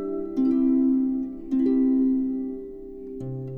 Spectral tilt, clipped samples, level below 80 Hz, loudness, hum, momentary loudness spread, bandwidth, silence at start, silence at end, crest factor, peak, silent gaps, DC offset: -11 dB/octave; under 0.1%; -50 dBFS; -24 LUFS; none; 16 LU; 2.1 kHz; 0 s; 0 s; 10 dB; -14 dBFS; none; under 0.1%